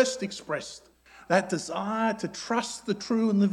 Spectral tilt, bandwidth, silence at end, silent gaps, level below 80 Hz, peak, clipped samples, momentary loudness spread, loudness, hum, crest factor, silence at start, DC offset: -4.5 dB/octave; 12 kHz; 0 s; none; -66 dBFS; -6 dBFS; under 0.1%; 9 LU; -29 LUFS; none; 22 dB; 0 s; under 0.1%